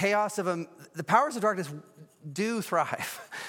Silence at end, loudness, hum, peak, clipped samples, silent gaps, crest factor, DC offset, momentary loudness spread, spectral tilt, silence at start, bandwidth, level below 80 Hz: 0 s; -29 LUFS; none; -10 dBFS; under 0.1%; none; 20 dB; under 0.1%; 15 LU; -4.5 dB/octave; 0 s; 17.5 kHz; -78 dBFS